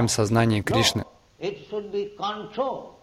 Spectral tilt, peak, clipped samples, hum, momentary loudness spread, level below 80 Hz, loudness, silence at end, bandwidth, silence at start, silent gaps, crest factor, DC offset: -4.5 dB/octave; -6 dBFS; under 0.1%; none; 13 LU; -52 dBFS; -25 LUFS; 0.1 s; 16 kHz; 0 s; none; 20 dB; under 0.1%